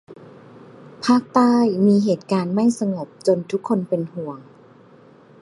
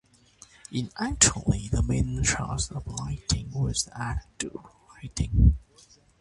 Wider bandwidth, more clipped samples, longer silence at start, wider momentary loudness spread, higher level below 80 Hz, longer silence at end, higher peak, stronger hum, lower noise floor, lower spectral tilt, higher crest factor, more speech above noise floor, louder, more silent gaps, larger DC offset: about the same, 11.5 kHz vs 11.5 kHz; neither; second, 0.1 s vs 0.7 s; second, 11 LU vs 15 LU; second, -66 dBFS vs -32 dBFS; first, 1 s vs 0.6 s; about the same, -2 dBFS vs -4 dBFS; neither; second, -48 dBFS vs -57 dBFS; first, -7 dB/octave vs -3.5 dB/octave; about the same, 20 dB vs 24 dB; about the same, 30 dB vs 31 dB; first, -20 LUFS vs -27 LUFS; neither; neither